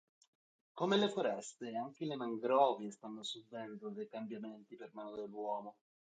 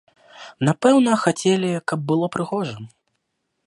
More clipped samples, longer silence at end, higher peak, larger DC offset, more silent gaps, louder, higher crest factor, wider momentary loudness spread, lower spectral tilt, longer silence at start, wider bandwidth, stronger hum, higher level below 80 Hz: neither; second, 0.4 s vs 0.8 s; second, -18 dBFS vs -2 dBFS; neither; neither; second, -39 LUFS vs -20 LUFS; about the same, 22 dB vs 20 dB; first, 17 LU vs 10 LU; about the same, -5 dB/octave vs -5.5 dB/octave; first, 0.75 s vs 0.35 s; second, 9 kHz vs 11.5 kHz; neither; second, -88 dBFS vs -66 dBFS